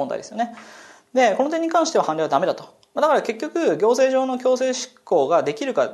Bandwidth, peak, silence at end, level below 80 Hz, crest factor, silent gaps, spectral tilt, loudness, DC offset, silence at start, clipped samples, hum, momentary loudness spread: 12 kHz; -4 dBFS; 0 s; -76 dBFS; 16 dB; none; -4 dB/octave; -21 LUFS; under 0.1%; 0 s; under 0.1%; none; 10 LU